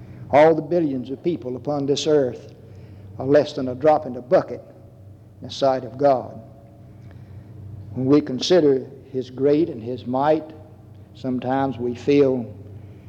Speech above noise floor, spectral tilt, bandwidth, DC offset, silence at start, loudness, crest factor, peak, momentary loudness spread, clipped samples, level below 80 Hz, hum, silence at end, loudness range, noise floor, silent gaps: 24 dB; -6.5 dB/octave; 8.6 kHz; under 0.1%; 0 s; -21 LUFS; 18 dB; -4 dBFS; 22 LU; under 0.1%; -60 dBFS; none; 0.1 s; 3 LU; -44 dBFS; none